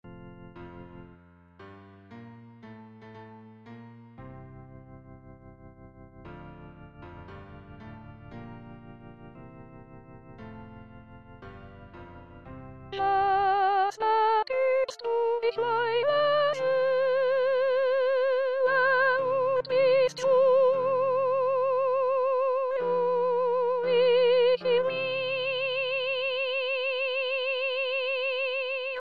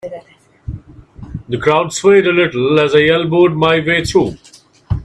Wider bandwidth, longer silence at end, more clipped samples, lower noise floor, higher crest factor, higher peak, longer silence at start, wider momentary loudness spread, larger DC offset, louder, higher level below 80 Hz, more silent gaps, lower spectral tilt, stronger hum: second, 7.2 kHz vs 12 kHz; about the same, 0 s vs 0 s; neither; first, -55 dBFS vs -36 dBFS; about the same, 14 dB vs 14 dB; second, -14 dBFS vs 0 dBFS; about the same, 0.05 s vs 0.05 s; first, 25 LU vs 20 LU; neither; second, -25 LUFS vs -13 LUFS; second, -60 dBFS vs -38 dBFS; neither; about the same, -4.5 dB/octave vs -5.5 dB/octave; neither